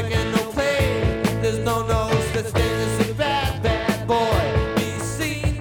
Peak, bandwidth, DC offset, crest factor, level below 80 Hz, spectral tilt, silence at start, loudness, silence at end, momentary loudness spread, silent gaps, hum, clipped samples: -6 dBFS; 19.5 kHz; under 0.1%; 16 dB; -32 dBFS; -5.5 dB/octave; 0 s; -22 LUFS; 0 s; 3 LU; none; none; under 0.1%